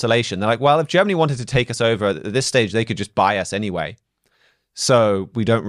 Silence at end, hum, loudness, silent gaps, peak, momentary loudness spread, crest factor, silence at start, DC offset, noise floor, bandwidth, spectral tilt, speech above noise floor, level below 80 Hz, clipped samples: 0 s; none; -19 LUFS; none; -4 dBFS; 8 LU; 16 dB; 0 s; under 0.1%; -62 dBFS; 13 kHz; -5 dB/octave; 43 dB; -50 dBFS; under 0.1%